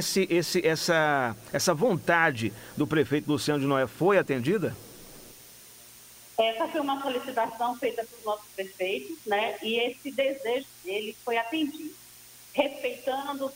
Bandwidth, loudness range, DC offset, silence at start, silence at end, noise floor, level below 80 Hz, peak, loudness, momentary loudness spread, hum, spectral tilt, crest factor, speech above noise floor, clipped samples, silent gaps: 16 kHz; 5 LU; under 0.1%; 0 s; 0 s; -50 dBFS; -64 dBFS; -8 dBFS; -28 LUFS; 22 LU; 60 Hz at -60 dBFS; -4.5 dB/octave; 20 dB; 23 dB; under 0.1%; none